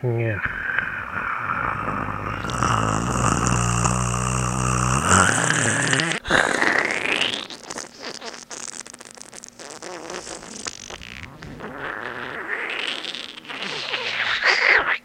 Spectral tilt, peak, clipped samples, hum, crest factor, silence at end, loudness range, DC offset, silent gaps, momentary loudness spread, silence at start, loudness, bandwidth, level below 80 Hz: -3 dB/octave; 0 dBFS; under 0.1%; none; 24 dB; 0.05 s; 15 LU; under 0.1%; none; 18 LU; 0 s; -22 LUFS; 15.5 kHz; -40 dBFS